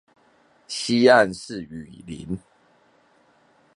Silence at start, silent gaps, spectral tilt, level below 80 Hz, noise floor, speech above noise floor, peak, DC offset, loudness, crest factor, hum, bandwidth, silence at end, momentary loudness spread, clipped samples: 0.7 s; none; -4.5 dB/octave; -56 dBFS; -60 dBFS; 38 dB; -2 dBFS; under 0.1%; -21 LUFS; 22 dB; none; 11.5 kHz; 1.4 s; 23 LU; under 0.1%